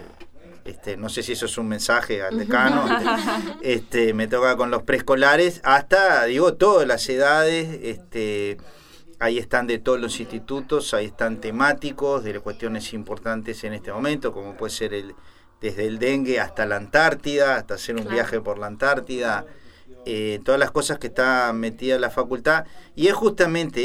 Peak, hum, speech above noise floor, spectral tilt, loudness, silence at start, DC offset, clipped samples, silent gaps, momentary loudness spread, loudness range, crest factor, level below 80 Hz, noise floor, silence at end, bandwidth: -2 dBFS; none; 20 dB; -4 dB/octave; -22 LUFS; 0 s; under 0.1%; under 0.1%; none; 13 LU; 8 LU; 20 dB; -48 dBFS; -41 dBFS; 0 s; 16 kHz